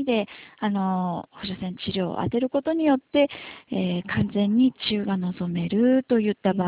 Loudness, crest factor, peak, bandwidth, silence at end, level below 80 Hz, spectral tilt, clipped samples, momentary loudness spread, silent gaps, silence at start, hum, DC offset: -24 LUFS; 16 dB; -8 dBFS; 4 kHz; 0 s; -54 dBFS; -11 dB/octave; under 0.1%; 10 LU; none; 0 s; none; under 0.1%